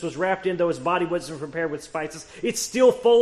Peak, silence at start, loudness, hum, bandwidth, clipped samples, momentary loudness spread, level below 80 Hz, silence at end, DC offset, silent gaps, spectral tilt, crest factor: -6 dBFS; 0 s; -24 LUFS; none; 13 kHz; under 0.1%; 12 LU; -58 dBFS; 0 s; under 0.1%; none; -4 dB/octave; 16 dB